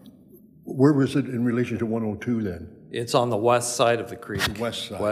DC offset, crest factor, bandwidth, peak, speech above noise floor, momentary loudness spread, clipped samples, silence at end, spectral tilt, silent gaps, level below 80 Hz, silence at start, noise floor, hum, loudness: under 0.1%; 18 dB; 16 kHz; -6 dBFS; 27 dB; 12 LU; under 0.1%; 0 s; -5 dB/octave; none; -54 dBFS; 0.05 s; -51 dBFS; none; -24 LUFS